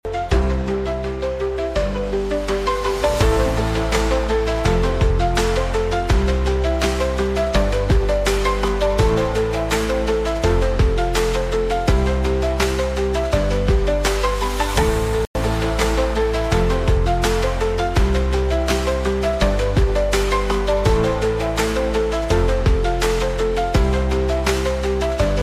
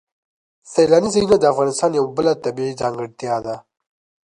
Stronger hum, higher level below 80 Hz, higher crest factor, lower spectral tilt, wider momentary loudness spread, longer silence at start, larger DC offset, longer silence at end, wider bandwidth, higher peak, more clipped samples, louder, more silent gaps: neither; first, -22 dBFS vs -54 dBFS; about the same, 16 dB vs 18 dB; about the same, -5.5 dB/octave vs -5 dB/octave; second, 3 LU vs 10 LU; second, 0.05 s vs 0.65 s; neither; second, 0 s vs 0.75 s; first, 15.5 kHz vs 11 kHz; about the same, -2 dBFS vs -2 dBFS; neither; about the same, -20 LUFS vs -18 LUFS; first, 15.27-15.34 s vs none